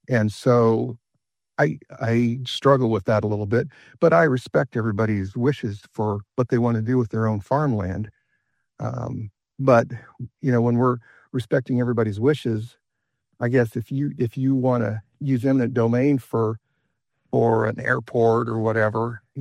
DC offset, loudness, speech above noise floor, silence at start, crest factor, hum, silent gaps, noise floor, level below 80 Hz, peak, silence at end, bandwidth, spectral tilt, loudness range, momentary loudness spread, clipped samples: under 0.1%; -22 LUFS; 58 dB; 0.1 s; 20 dB; none; none; -80 dBFS; -60 dBFS; -2 dBFS; 0 s; 11.5 kHz; -8 dB/octave; 3 LU; 12 LU; under 0.1%